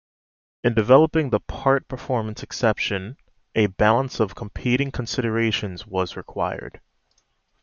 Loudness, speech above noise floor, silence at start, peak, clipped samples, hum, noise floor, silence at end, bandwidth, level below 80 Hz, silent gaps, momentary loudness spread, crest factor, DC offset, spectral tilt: -23 LUFS; 45 dB; 0.65 s; -2 dBFS; under 0.1%; none; -67 dBFS; 0.95 s; 7.4 kHz; -44 dBFS; none; 12 LU; 20 dB; under 0.1%; -6 dB/octave